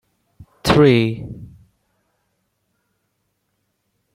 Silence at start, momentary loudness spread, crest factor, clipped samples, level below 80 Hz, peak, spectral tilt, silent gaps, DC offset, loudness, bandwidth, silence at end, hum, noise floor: 0.65 s; 23 LU; 20 dB; under 0.1%; -46 dBFS; -2 dBFS; -6.5 dB/octave; none; under 0.1%; -15 LUFS; 16 kHz; 2.7 s; none; -71 dBFS